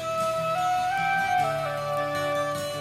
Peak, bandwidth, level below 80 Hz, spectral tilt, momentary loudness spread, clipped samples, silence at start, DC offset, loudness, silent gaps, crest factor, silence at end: -14 dBFS; 16 kHz; -58 dBFS; -4 dB/octave; 4 LU; under 0.1%; 0 s; under 0.1%; -26 LUFS; none; 12 dB; 0 s